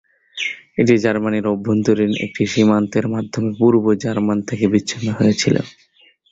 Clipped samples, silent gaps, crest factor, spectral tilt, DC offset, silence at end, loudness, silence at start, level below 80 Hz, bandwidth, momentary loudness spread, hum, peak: under 0.1%; none; 16 dB; -6 dB/octave; under 0.1%; 0.6 s; -18 LUFS; 0.35 s; -52 dBFS; 8 kHz; 8 LU; none; -2 dBFS